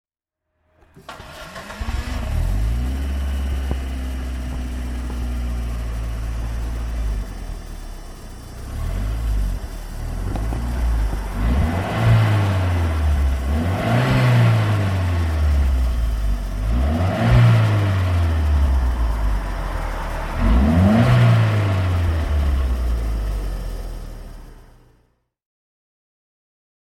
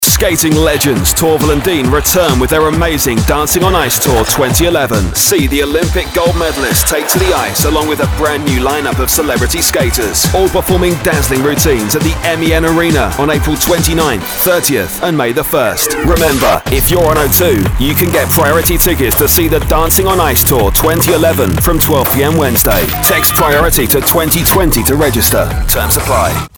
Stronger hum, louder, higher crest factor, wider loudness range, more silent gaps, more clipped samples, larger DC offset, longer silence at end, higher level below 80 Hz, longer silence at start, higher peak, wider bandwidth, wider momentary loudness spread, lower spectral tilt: neither; second, -21 LUFS vs -10 LUFS; first, 18 dB vs 10 dB; first, 11 LU vs 2 LU; neither; neither; neither; first, 2.2 s vs 0.1 s; about the same, -24 dBFS vs -20 dBFS; first, 1.1 s vs 0 s; about the same, -2 dBFS vs 0 dBFS; second, 14.5 kHz vs over 20 kHz; first, 18 LU vs 4 LU; first, -7 dB/octave vs -4 dB/octave